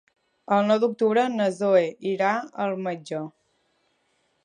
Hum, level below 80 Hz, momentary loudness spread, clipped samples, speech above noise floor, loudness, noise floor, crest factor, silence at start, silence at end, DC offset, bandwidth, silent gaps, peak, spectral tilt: none; -78 dBFS; 11 LU; under 0.1%; 47 dB; -24 LUFS; -70 dBFS; 16 dB; 0.5 s; 1.15 s; under 0.1%; 10 kHz; none; -8 dBFS; -6 dB/octave